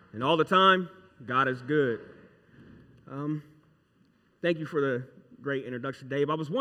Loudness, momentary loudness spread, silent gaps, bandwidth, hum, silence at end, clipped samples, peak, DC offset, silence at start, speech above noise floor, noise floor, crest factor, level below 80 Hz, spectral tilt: -28 LUFS; 17 LU; none; 11 kHz; none; 0 s; under 0.1%; -8 dBFS; under 0.1%; 0.15 s; 38 dB; -66 dBFS; 22 dB; -72 dBFS; -6.5 dB/octave